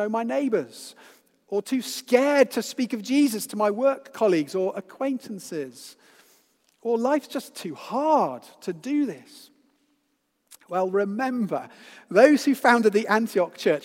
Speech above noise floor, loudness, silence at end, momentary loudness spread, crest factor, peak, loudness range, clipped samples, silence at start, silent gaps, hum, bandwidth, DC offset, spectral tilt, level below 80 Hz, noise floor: 49 dB; -24 LUFS; 0.05 s; 16 LU; 22 dB; -2 dBFS; 7 LU; under 0.1%; 0 s; none; none; 16.5 kHz; under 0.1%; -4.5 dB/octave; -84 dBFS; -73 dBFS